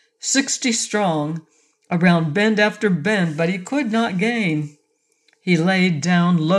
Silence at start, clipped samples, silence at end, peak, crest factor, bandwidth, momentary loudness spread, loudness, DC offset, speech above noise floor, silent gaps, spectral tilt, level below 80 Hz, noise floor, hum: 0.25 s; under 0.1%; 0 s; -4 dBFS; 16 dB; 11.5 kHz; 9 LU; -19 LUFS; under 0.1%; 47 dB; none; -5 dB/octave; -70 dBFS; -66 dBFS; none